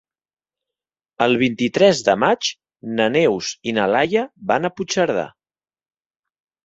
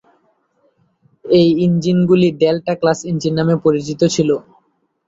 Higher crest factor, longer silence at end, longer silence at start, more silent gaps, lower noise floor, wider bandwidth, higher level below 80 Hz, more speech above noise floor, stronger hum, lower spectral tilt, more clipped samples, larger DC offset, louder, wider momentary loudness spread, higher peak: first, 20 dB vs 14 dB; first, 1.35 s vs 0.65 s; about the same, 1.2 s vs 1.25 s; neither; first, under -90 dBFS vs -62 dBFS; about the same, 8 kHz vs 8 kHz; second, -60 dBFS vs -54 dBFS; first, over 72 dB vs 47 dB; neither; second, -4.5 dB/octave vs -6.5 dB/octave; neither; neither; second, -19 LUFS vs -15 LUFS; first, 9 LU vs 6 LU; about the same, 0 dBFS vs -2 dBFS